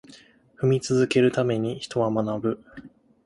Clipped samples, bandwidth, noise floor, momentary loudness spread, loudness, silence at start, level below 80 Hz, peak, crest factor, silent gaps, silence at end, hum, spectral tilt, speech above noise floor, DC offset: under 0.1%; 11.5 kHz; -52 dBFS; 8 LU; -24 LUFS; 0.1 s; -60 dBFS; -8 dBFS; 16 dB; none; 0.4 s; none; -6.5 dB/octave; 29 dB; under 0.1%